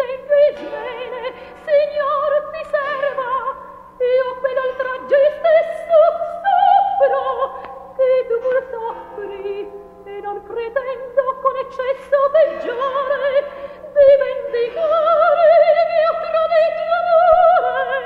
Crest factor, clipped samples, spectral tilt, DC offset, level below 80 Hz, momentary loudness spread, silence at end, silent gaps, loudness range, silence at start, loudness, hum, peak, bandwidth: 16 dB; under 0.1%; -5 dB/octave; under 0.1%; -54 dBFS; 16 LU; 0 s; none; 8 LU; 0 s; -17 LUFS; none; -2 dBFS; 5 kHz